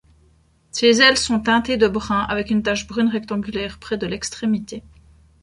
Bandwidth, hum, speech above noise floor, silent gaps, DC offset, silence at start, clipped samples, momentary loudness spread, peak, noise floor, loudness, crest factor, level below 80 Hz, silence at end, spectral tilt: 11.5 kHz; none; 37 dB; none; under 0.1%; 0.75 s; under 0.1%; 13 LU; -2 dBFS; -57 dBFS; -19 LUFS; 20 dB; -46 dBFS; 0.6 s; -3.5 dB/octave